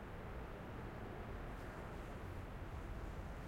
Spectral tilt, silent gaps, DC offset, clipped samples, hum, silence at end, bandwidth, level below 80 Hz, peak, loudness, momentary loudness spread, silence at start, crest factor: -7 dB/octave; none; under 0.1%; under 0.1%; none; 0 s; 16 kHz; -52 dBFS; -38 dBFS; -50 LUFS; 1 LU; 0 s; 12 dB